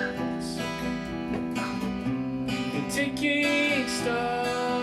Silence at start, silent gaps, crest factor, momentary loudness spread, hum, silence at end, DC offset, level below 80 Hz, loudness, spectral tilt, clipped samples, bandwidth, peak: 0 s; none; 14 dB; 8 LU; none; 0 s; under 0.1%; -52 dBFS; -28 LUFS; -4.5 dB/octave; under 0.1%; 15 kHz; -14 dBFS